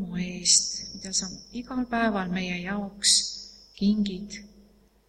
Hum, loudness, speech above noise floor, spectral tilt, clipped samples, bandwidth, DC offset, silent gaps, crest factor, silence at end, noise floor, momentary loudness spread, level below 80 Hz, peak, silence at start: none; -25 LUFS; 31 dB; -2.5 dB/octave; under 0.1%; 12.5 kHz; under 0.1%; none; 22 dB; 0.6 s; -58 dBFS; 18 LU; -54 dBFS; -6 dBFS; 0 s